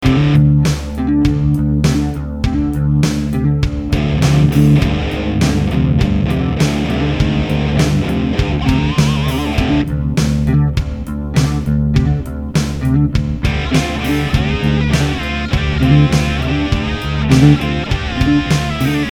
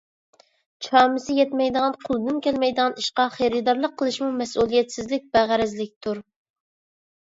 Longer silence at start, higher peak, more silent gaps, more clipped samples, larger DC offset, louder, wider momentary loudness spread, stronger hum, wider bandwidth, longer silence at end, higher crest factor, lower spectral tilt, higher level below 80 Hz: second, 0 s vs 0.8 s; first, 0 dBFS vs -4 dBFS; second, none vs 5.96-6.01 s; neither; neither; first, -15 LUFS vs -22 LUFS; about the same, 7 LU vs 9 LU; neither; first, 15 kHz vs 8 kHz; second, 0 s vs 1 s; second, 14 dB vs 20 dB; first, -6.5 dB/octave vs -4 dB/octave; first, -22 dBFS vs -58 dBFS